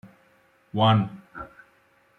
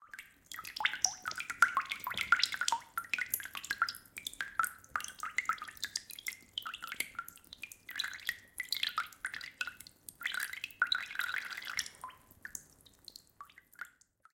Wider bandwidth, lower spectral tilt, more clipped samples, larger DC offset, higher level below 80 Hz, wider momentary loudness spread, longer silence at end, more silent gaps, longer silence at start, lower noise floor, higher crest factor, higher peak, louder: second, 4.3 kHz vs 17 kHz; first, -8.5 dB/octave vs 1.5 dB/octave; neither; neither; first, -60 dBFS vs -74 dBFS; about the same, 21 LU vs 20 LU; first, 0.7 s vs 0.45 s; neither; first, 0.75 s vs 0 s; about the same, -62 dBFS vs -63 dBFS; second, 20 dB vs 30 dB; about the same, -8 dBFS vs -8 dBFS; first, -23 LUFS vs -36 LUFS